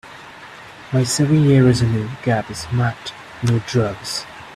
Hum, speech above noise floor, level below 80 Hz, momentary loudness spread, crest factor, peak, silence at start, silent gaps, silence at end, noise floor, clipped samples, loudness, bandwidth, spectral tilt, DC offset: none; 21 dB; -46 dBFS; 24 LU; 16 dB; -2 dBFS; 0.05 s; none; 0 s; -39 dBFS; under 0.1%; -18 LUFS; 13.5 kHz; -6 dB/octave; under 0.1%